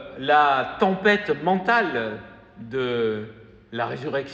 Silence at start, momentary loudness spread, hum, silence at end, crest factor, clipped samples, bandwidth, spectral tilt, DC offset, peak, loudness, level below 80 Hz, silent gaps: 0 s; 15 LU; none; 0 s; 18 dB; under 0.1%; 7.6 kHz; -6.5 dB/octave; under 0.1%; -6 dBFS; -22 LUFS; -58 dBFS; none